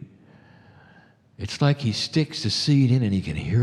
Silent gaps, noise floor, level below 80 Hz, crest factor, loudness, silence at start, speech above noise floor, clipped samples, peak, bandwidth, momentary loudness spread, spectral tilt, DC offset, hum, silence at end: none; -54 dBFS; -50 dBFS; 16 dB; -23 LUFS; 0 s; 33 dB; under 0.1%; -8 dBFS; 11 kHz; 7 LU; -6 dB/octave; under 0.1%; none; 0 s